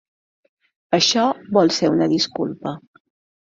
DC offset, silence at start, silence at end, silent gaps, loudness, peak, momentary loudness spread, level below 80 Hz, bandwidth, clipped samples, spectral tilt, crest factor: under 0.1%; 0.9 s; 0.65 s; none; -18 LUFS; -2 dBFS; 13 LU; -62 dBFS; 7.8 kHz; under 0.1%; -4 dB/octave; 18 dB